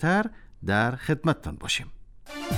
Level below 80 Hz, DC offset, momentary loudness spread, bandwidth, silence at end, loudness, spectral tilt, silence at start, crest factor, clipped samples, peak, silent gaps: -46 dBFS; under 0.1%; 13 LU; 16.5 kHz; 0 s; -27 LUFS; -5 dB/octave; 0 s; 20 dB; under 0.1%; -8 dBFS; none